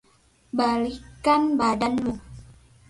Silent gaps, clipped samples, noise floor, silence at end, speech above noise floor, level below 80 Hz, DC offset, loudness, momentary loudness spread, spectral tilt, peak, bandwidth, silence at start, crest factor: none; under 0.1%; -60 dBFS; 0.4 s; 38 dB; -50 dBFS; under 0.1%; -24 LUFS; 11 LU; -5.5 dB/octave; -8 dBFS; 11.5 kHz; 0.55 s; 16 dB